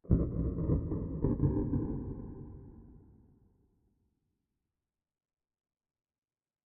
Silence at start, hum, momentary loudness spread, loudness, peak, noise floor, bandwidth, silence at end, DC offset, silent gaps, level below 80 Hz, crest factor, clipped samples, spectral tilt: 0.05 s; none; 18 LU; -34 LUFS; -12 dBFS; under -90 dBFS; 2.2 kHz; 3.7 s; under 0.1%; none; -44 dBFS; 24 dB; under 0.1%; -12.5 dB/octave